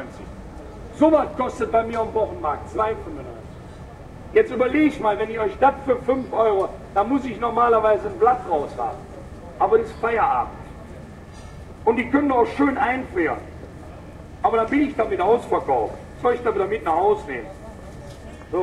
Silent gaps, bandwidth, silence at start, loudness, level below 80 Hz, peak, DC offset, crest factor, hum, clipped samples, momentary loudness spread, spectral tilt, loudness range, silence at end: none; 11.5 kHz; 0 s; -21 LUFS; -44 dBFS; -4 dBFS; under 0.1%; 18 dB; none; under 0.1%; 20 LU; -7 dB/octave; 3 LU; 0 s